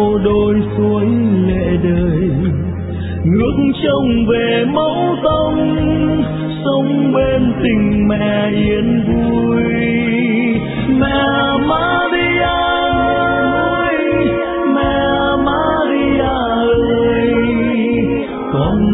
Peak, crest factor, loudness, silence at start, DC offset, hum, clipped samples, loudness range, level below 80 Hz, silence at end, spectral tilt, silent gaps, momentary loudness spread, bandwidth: -2 dBFS; 12 dB; -14 LUFS; 0 s; under 0.1%; none; under 0.1%; 1 LU; -30 dBFS; 0 s; -11 dB/octave; none; 3 LU; 4 kHz